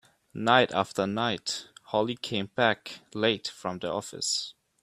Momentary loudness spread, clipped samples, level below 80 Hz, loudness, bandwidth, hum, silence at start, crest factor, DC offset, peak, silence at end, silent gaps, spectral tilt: 12 LU; under 0.1%; -68 dBFS; -28 LUFS; 15 kHz; none; 0.35 s; 24 dB; under 0.1%; -4 dBFS; 0.3 s; none; -3.5 dB/octave